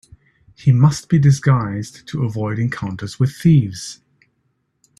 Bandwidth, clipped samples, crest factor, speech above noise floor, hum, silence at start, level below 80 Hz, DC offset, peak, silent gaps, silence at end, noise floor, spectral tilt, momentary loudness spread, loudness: 12 kHz; under 0.1%; 16 dB; 51 dB; none; 0.65 s; -50 dBFS; under 0.1%; -2 dBFS; none; 1.05 s; -68 dBFS; -7 dB/octave; 14 LU; -18 LUFS